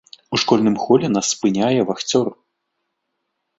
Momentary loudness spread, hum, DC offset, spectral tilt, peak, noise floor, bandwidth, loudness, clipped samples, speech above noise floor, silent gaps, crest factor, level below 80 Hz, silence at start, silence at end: 5 LU; none; under 0.1%; -4.5 dB/octave; -2 dBFS; -75 dBFS; 8.2 kHz; -18 LUFS; under 0.1%; 58 dB; none; 18 dB; -58 dBFS; 0.3 s; 1.25 s